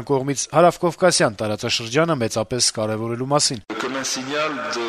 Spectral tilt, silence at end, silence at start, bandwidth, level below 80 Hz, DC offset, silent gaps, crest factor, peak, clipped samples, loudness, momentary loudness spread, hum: -3.5 dB/octave; 0 s; 0 s; 13.5 kHz; -56 dBFS; under 0.1%; none; 18 dB; -2 dBFS; under 0.1%; -20 LUFS; 8 LU; none